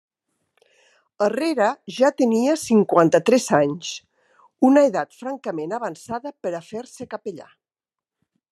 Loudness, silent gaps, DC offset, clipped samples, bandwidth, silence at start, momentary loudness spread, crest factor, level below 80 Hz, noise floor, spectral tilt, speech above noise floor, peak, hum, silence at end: -20 LUFS; none; under 0.1%; under 0.1%; 13 kHz; 1.2 s; 16 LU; 20 dB; -70 dBFS; under -90 dBFS; -5 dB/octave; over 70 dB; -2 dBFS; none; 1.1 s